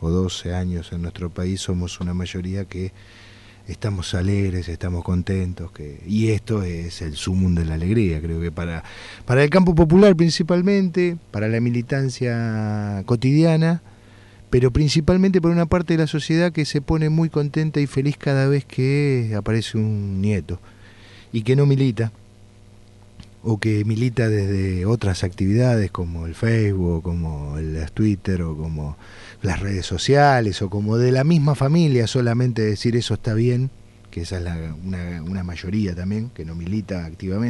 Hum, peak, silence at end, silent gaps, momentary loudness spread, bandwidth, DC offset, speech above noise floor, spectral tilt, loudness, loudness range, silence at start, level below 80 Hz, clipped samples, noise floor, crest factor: none; -2 dBFS; 0 s; none; 12 LU; 11.5 kHz; under 0.1%; 27 dB; -7 dB/octave; -21 LUFS; 8 LU; 0 s; -38 dBFS; under 0.1%; -47 dBFS; 18 dB